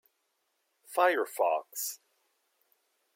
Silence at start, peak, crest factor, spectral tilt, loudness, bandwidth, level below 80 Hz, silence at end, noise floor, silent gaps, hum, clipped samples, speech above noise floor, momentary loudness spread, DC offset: 0.9 s; -12 dBFS; 22 dB; -0.5 dB/octave; -30 LUFS; 16.5 kHz; under -90 dBFS; 1.2 s; -78 dBFS; none; none; under 0.1%; 49 dB; 10 LU; under 0.1%